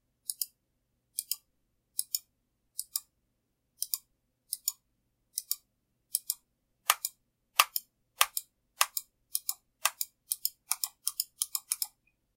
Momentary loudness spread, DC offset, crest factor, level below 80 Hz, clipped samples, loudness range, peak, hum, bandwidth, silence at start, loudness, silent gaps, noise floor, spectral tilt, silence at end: 10 LU; under 0.1%; 36 dB; -82 dBFS; under 0.1%; 8 LU; 0 dBFS; none; 17 kHz; 0.3 s; -33 LUFS; none; -79 dBFS; 5 dB/octave; 0.5 s